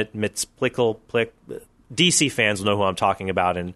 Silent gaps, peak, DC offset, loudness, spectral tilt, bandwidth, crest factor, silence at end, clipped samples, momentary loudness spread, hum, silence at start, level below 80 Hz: none; -2 dBFS; under 0.1%; -21 LUFS; -3 dB/octave; 12.5 kHz; 20 dB; 0 s; under 0.1%; 14 LU; none; 0 s; -54 dBFS